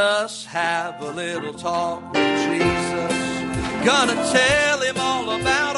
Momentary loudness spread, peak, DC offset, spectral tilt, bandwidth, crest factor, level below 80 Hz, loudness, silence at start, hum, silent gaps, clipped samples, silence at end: 10 LU; -4 dBFS; under 0.1%; -3.5 dB/octave; 11.5 kHz; 18 dB; -46 dBFS; -21 LUFS; 0 s; none; none; under 0.1%; 0 s